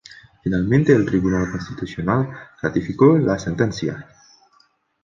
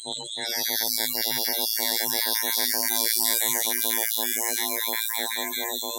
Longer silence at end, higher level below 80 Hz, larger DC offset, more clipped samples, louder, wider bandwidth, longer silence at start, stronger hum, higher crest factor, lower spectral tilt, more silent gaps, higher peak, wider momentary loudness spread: first, 1 s vs 0 s; first, -44 dBFS vs -74 dBFS; neither; neither; first, -20 LUFS vs -23 LUFS; second, 7.4 kHz vs 17.5 kHz; about the same, 0.1 s vs 0 s; neither; second, 18 dB vs 26 dB; first, -7.5 dB/octave vs 1 dB/octave; neither; about the same, -2 dBFS vs 0 dBFS; first, 13 LU vs 6 LU